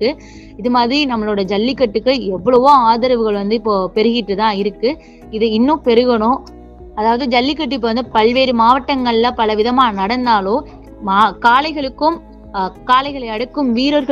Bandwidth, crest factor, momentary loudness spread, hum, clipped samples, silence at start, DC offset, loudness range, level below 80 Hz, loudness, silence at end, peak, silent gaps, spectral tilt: 8 kHz; 14 dB; 10 LU; none; under 0.1%; 0 s; under 0.1%; 2 LU; -40 dBFS; -15 LUFS; 0 s; 0 dBFS; none; -6 dB/octave